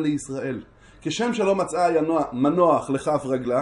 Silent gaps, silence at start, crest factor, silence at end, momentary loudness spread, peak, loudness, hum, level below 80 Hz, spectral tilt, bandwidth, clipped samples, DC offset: none; 0 s; 16 dB; 0 s; 10 LU; -6 dBFS; -23 LUFS; none; -56 dBFS; -5.5 dB/octave; 11.5 kHz; under 0.1%; under 0.1%